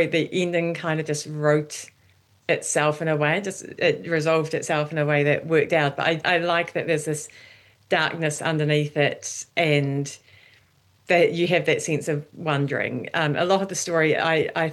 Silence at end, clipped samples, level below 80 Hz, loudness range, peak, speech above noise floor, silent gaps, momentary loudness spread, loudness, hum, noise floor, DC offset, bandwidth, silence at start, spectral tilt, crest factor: 0 s; under 0.1%; -70 dBFS; 2 LU; -8 dBFS; 37 dB; none; 8 LU; -23 LUFS; none; -60 dBFS; under 0.1%; 12.5 kHz; 0 s; -4.5 dB/octave; 16 dB